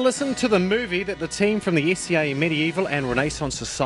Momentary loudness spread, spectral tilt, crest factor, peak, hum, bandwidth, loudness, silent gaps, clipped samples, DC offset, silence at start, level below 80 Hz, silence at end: 5 LU; -4.5 dB/octave; 16 dB; -6 dBFS; none; 11.5 kHz; -22 LUFS; none; under 0.1%; under 0.1%; 0 s; -46 dBFS; 0 s